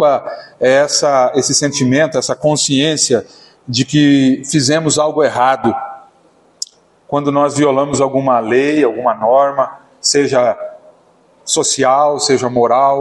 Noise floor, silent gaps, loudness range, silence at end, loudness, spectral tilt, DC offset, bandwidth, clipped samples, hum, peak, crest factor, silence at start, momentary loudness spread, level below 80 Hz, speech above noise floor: -51 dBFS; none; 3 LU; 0 s; -13 LUFS; -4 dB/octave; under 0.1%; 11.5 kHz; under 0.1%; none; 0 dBFS; 14 dB; 0 s; 9 LU; -56 dBFS; 38 dB